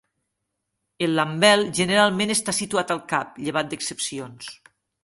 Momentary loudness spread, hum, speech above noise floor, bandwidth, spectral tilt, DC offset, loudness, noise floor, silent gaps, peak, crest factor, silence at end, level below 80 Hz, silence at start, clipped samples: 14 LU; none; 57 dB; 12 kHz; -3 dB/octave; under 0.1%; -22 LUFS; -79 dBFS; none; -2 dBFS; 22 dB; 0.5 s; -64 dBFS; 1 s; under 0.1%